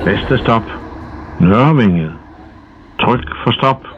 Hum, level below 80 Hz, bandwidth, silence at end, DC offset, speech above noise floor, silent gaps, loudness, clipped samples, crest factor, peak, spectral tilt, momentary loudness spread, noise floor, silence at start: none; -34 dBFS; 6.4 kHz; 0 s; under 0.1%; 26 dB; none; -13 LUFS; under 0.1%; 14 dB; 0 dBFS; -8.5 dB/octave; 20 LU; -39 dBFS; 0 s